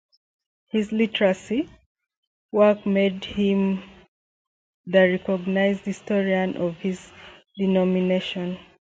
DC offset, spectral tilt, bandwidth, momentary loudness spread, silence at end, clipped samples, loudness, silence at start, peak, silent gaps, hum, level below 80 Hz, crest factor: under 0.1%; -7 dB/octave; 7.8 kHz; 11 LU; 0.4 s; under 0.1%; -23 LUFS; 0.75 s; -6 dBFS; 1.86-1.95 s, 2.17-2.49 s, 4.08-4.84 s; none; -58 dBFS; 18 dB